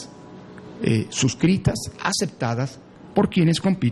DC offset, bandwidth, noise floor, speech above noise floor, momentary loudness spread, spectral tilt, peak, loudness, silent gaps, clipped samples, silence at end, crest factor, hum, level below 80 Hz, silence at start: under 0.1%; 12 kHz; -42 dBFS; 21 dB; 21 LU; -5.5 dB/octave; -4 dBFS; -22 LUFS; none; under 0.1%; 0 s; 18 dB; none; -48 dBFS; 0 s